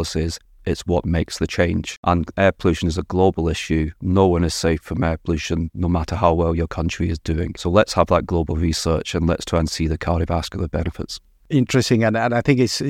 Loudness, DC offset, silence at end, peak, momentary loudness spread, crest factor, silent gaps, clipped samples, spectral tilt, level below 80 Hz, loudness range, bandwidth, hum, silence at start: -20 LUFS; under 0.1%; 0 s; -2 dBFS; 7 LU; 18 dB; 1.97-2.03 s; under 0.1%; -6 dB/octave; -32 dBFS; 2 LU; 14.5 kHz; none; 0 s